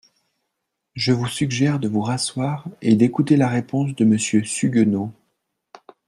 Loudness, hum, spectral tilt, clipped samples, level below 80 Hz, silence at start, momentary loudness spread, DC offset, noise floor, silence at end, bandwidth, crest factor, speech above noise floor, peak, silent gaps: -20 LUFS; none; -5.5 dB/octave; under 0.1%; -60 dBFS; 0.95 s; 8 LU; under 0.1%; -78 dBFS; 0.95 s; 12 kHz; 18 dB; 59 dB; -4 dBFS; none